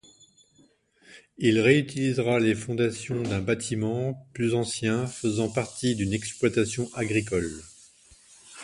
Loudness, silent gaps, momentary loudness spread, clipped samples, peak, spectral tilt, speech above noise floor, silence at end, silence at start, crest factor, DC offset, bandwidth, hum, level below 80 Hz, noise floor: -26 LUFS; none; 8 LU; under 0.1%; -6 dBFS; -5.5 dB/octave; 36 dB; 0 s; 1.1 s; 20 dB; under 0.1%; 11.5 kHz; none; -54 dBFS; -62 dBFS